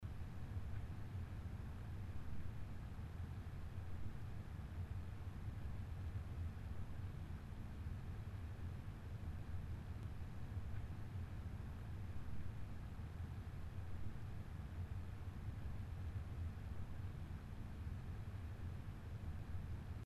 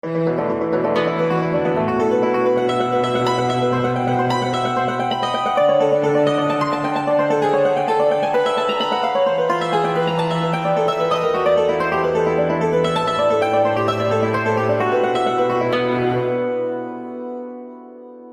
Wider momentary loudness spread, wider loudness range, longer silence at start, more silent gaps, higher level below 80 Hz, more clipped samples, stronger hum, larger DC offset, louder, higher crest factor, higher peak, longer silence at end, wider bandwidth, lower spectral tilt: about the same, 3 LU vs 4 LU; about the same, 1 LU vs 1 LU; about the same, 0 s vs 0.05 s; neither; about the same, -52 dBFS vs -54 dBFS; neither; neither; neither; second, -51 LUFS vs -18 LUFS; about the same, 12 dB vs 12 dB; second, -34 dBFS vs -6 dBFS; about the same, 0 s vs 0 s; about the same, 13 kHz vs 13 kHz; first, -7.5 dB/octave vs -6 dB/octave